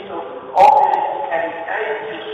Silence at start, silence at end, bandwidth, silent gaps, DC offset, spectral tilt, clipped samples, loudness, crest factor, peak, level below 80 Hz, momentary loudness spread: 0 s; 0 s; 9.2 kHz; none; under 0.1%; -4 dB/octave; under 0.1%; -16 LUFS; 16 dB; 0 dBFS; -62 dBFS; 15 LU